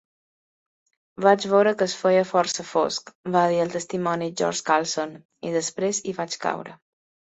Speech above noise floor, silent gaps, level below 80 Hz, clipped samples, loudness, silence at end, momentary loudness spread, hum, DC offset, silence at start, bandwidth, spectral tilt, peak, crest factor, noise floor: over 67 dB; 3.15-3.24 s, 5.25-5.29 s; -70 dBFS; under 0.1%; -23 LUFS; 0.6 s; 10 LU; none; under 0.1%; 1.2 s; 8.2 kHz; -4 dB/octave; -4 dBFS; 22 dB; under -90 dBFS